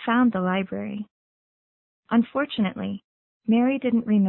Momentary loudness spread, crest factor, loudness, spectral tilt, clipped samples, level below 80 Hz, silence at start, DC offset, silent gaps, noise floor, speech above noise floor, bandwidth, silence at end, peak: 13 LU; 16 dB; -24 LUFS; -11 dB/octave; under 0.1%; -62 dBFS; 0 s; under 0.1%; 1.11-2.03 s, 3.04-3.40 s; under -90 dBFS; over 68 dB; 4.2 kHz; 0 s; -8 dBFS